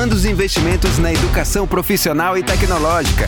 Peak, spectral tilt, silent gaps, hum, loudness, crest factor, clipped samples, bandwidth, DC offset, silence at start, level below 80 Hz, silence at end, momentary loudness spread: -4 dBFS; -4.5 dB/octave; none; none; -16 LUFS; 10 dB; under 0.1%; over 20 kHz; under 0.1%; 0 s; -20 dBFS; 0 s; 1 LU